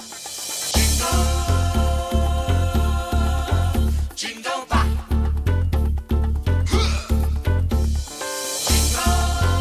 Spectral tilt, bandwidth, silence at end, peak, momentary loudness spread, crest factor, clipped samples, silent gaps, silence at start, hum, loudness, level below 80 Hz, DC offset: -4.5 dB/octave; 16 kHz; 0 s; -4 dBFS; 7 LU; 16 dB; under 0.1%; none; 0 s; none; -21 LUFS; -22 dBFS; under 0.1%